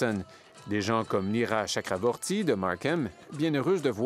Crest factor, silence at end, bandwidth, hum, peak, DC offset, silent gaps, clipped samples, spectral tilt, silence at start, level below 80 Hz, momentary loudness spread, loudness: 18 dB; 0 s; 15.5 kHz; none; -10 dBFS; under 0.1%; none; under 0.1%; -5 dB/octave; 0 s; -70 dBFS; 7 LU; -29 LUFS